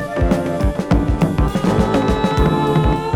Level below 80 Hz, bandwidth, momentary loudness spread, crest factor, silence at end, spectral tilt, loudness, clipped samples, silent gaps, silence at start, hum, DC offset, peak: -22 dBFS; 15.5 kHz; 2 LU; 14 dB; 0 s; -7.5 dB/octave; -17 LUFS; under 0.1%; none; 0 s; none; under 0.1%; -2 dBFS